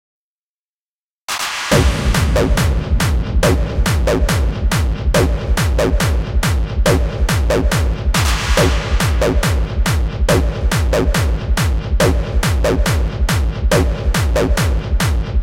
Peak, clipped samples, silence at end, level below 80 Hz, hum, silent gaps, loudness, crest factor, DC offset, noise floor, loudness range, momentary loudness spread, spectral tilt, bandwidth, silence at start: 0 dBFS; under 0.1%; 0 s; -18 dBFS; none; none; -16 LUFS; 14 dB; under 0.1%; under -90 dBFS; 1 LU; 3 LU; -5 dB/octave; 16.5 kHz; 1.3 s